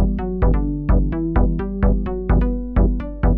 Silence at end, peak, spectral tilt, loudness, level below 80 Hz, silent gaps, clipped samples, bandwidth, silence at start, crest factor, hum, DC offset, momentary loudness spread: 0 s; -4 dBFS; -12.5 dB/octave; -20 LUFS; -20 dBFS; none; under 0.1%; 3.2 kHz; 0 s; 12 dB; none; under 0.1%; 2 LU